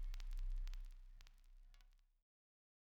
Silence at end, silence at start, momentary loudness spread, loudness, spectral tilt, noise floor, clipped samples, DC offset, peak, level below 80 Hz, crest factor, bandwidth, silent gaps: 0.9 s; 0 s; 16 LU; -54 LUFS; -3.5 dB/octave; -68 dBFS; under 0.1%; under 0.1%; -38 dBFS; -50 dBFS; 12 dB; 7.4 kHz; none